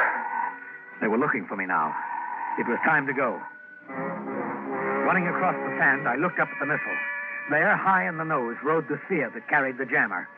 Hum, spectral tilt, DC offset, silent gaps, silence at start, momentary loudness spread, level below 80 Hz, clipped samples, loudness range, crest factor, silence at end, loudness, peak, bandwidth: none; -9.5 dB/octave; under 0.1%; none; 0 s; 10 LU; -78 dBFS; under 0.1%; 3 LU; 16 dB; 0 s; -25 LUFS; -10 dBFS; 5.2 kHz